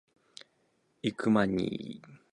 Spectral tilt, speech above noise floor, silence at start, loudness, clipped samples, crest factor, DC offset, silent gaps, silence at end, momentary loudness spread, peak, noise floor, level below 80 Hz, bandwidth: -6.5 dB/octave; 42 dB; 1.05 s; -30 LUFS; under 0.1%; 22 dB; under 0.1%; none; 0.15 s; 25 LU; -12 dBFS; -73 dBFS; -64 dBFS; 10.5 kHz